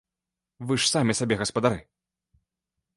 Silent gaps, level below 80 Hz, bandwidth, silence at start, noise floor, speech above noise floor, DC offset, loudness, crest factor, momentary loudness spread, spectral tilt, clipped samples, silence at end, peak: none; -56 dBFS; 11.5 kHz; 0.6 s; -88 dBFS; 63 dB; under 0.1%; -24 LUFS; 22 dB; 11 LU; -4 dB/octave; under 0.1%; 1.15 s; -6 dBFS